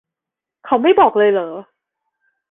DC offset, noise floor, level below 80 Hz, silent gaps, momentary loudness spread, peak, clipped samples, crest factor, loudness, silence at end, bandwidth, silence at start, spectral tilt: under 0.1%; -86 dBFS; -58 dBFS; none; 16 LU; -2 dBFS; under 0.1%; 16 dB; -14 LUFS; 0.9 s; 3.8 kHz; 0.65 s; -8.5 dB/octave